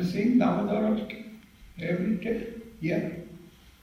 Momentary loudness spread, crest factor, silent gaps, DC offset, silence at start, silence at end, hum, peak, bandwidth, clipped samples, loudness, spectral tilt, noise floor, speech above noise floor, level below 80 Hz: 19 LU; 16 dB; none; under 0.1%; 0 s; 0.1 s; none; -12 dBFS; 15.5 kHz; under 0.1%; -28 LUFS; -8 dB/octave; -50 dBFS; 23 dB; -56 dBFS